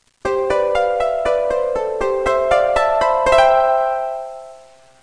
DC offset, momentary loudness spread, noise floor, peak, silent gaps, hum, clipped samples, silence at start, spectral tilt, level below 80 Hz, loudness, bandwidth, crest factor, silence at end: 0.2%; 10 LU; -45 dBFS; -2 dBFS; none; none; under 0.1%; 0.25 s; -4 dB/octave; -40 dBFS; -17 LUFS; 10.5 kHz; 16 dB; 0.45 s